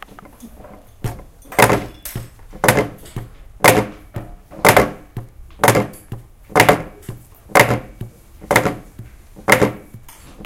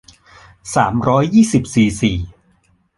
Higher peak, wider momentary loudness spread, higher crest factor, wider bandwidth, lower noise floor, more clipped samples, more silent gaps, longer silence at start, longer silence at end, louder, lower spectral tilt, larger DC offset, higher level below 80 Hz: about the same, 0 dBFS vs -2 dBFS; first, 23 LU vs 14 LU; about the same, 18 dB vs 16 dB; first, over 20 kHz vs 11.5 kHz; second, -40 dBFS vs -58 dBFS; first, 0.1% vs under 0.1%; neither; second, 0.45 s vs 0.65 s; second, 0 s vs 0.7 s; about the same, -16 LUFS vs -15 LUFS; second, -4 dB/octave vs -6 dB/octave; neither; about the same, -40 dBFS vs -38 dBFS